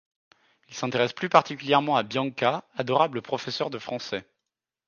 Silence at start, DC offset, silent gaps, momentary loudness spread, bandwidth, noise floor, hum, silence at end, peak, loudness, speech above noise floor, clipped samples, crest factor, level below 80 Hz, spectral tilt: 0.7 s; under 0.1%; none; 11 LU; 7.2 kHz; -86 dBFS; none; 0.65 s; -4 dBFS; -26 LUFS; 61 dB; under 0.1%; 24 dB; -72 dBFS; -5 dB/octave